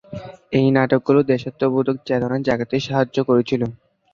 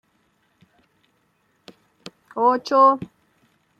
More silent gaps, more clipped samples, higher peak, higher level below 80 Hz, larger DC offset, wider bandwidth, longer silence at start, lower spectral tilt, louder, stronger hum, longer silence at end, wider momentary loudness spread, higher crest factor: neither; neither; about the same, -2 dBFS vs -4 dBFS; first, -54 dBFS vs -70 dBFS; neither; second, 7.2 kHz vs 8.2 kHz; second, 0.1 s vs 2.35 s; first, -7.5 dB/octave vs -5.5 dB/octave; about the same, -19 LUFS vs -18 LUFS; neither; second, 0.4 s vs 0.75 s; second, 7 LU vs 28 LU; about the same, 18 dB vs 20 dB